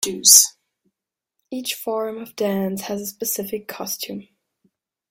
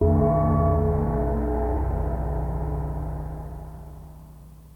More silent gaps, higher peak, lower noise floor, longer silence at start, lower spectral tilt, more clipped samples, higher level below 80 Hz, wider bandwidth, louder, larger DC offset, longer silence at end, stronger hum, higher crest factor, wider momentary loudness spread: neither; first, 0 dBFS vs -10 dBFS; first, -83 dBFS vs -45 dBFS; about the same, 0 s vs 0 s; second, -1.5 dB/octave vs -11 dB/octave; neither; second, -68 dBFS vs -30 dBFS; first, 17 kHz vs 2.6 kHz; first, -18 LUFS vs -25 LUFS; neither; first, 0.9 s vs 0.05 s; neither; first, 22 dB vs 14 dB; about the same, 19 LU vs 21 LU